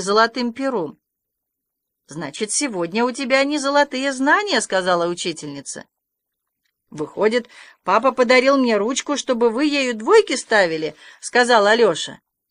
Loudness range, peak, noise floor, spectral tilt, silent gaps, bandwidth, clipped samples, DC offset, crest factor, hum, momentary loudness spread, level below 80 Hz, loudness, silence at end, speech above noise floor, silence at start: 6 LU; -2 dBFS; -80 dBFS; -3 dB/octave; none; 11 kHz; under 0.1%; under 0.1%; 18 dB; none; 16 LU; -68 dBFS; -18 LUFS; 0.35 s; 61 dB; 0 s